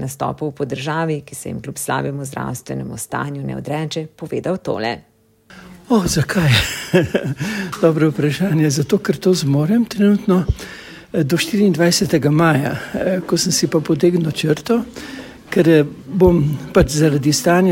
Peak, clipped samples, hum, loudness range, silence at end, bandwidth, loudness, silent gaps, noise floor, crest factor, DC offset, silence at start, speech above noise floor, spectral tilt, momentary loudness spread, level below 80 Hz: 0 dBFS; under 0.1%; none; 8 LU; 0 s; 16.5 kHz; -17 LUFS; none; -46 dBFS; 16 dB; under 0.1%; 0 s; 29 dB; -5.5 dB/octave; 12 LU; -38 dBFS